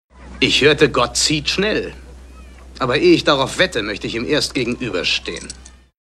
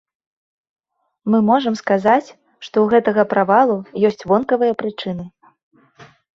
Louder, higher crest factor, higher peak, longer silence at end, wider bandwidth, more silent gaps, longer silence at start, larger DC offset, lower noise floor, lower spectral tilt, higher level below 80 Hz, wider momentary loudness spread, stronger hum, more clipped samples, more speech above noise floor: about the same, -16 LUFS vs -17 LUFS; about the same, 18 dB vs 16 dB; about the same, 0 dBFS vs -2 dBFS; about the same, 0.35 s vs 0.35 s; first, 13.5 kHz vs 7.4 kHz; second, none vs 5.63-5.71 s; second, 0.2 s vs 1.25 s; neither; second, -39 dBFS vs -47 dBFS; second, -3.5 dB/octave vs -7 dB/octave; first, -40 dBFS vs -60 dBFS; about the same, 12 LU vs 13 LU; neither; neither; second, 22 dB vs 31 dB